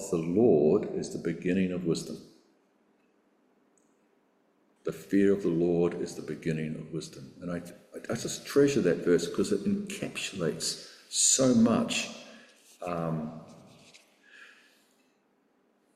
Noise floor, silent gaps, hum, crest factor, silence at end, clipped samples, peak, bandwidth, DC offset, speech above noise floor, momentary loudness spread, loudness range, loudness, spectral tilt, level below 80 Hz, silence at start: -70 dBFS; none; none; 20 dB; 1.5 s; under 0.1%; -12 dBFS; 15 kHz; under 0.1%; 42 dB; 17 LU; 13 LU; -28 LUFS; -4.5 dB/octave; -64 dBFS; 0 s